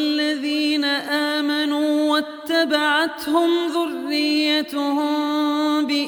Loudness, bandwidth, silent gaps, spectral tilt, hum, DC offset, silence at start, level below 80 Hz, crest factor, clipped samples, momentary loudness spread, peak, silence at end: -20 LUFS; 17.5 kHz; none; -2 dB/octave; none; under 0.1%; 0 s; -68 dBFS; 14 dB; under 0.1%; 4 LU; -6 dBFS; 0 s